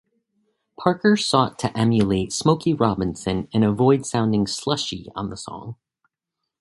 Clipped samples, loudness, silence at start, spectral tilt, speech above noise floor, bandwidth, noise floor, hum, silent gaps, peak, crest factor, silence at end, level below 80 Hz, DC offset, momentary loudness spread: under 0.1%; -21 LUFS; 0.8 s; -5.5 dB/octave; 62 dB; 11.5 kHz; -83 dBFS; none; none; 0 dBFS; 22 dB; 0.85 s; -48 dBFS; under 0.1%; 13 LU